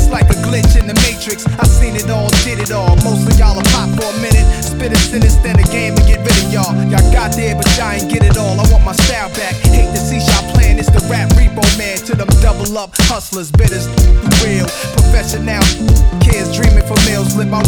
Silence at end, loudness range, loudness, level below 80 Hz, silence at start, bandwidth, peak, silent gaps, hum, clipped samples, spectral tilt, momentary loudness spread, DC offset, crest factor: 0 s; 1 LU; -12 LUFS; -12 dBFS; 0 s; 19.5 kHz; 0 dBFS; none; none; under 0.1%; -4.5 dB/octave; 5 LU; under 0.1%; 10 dB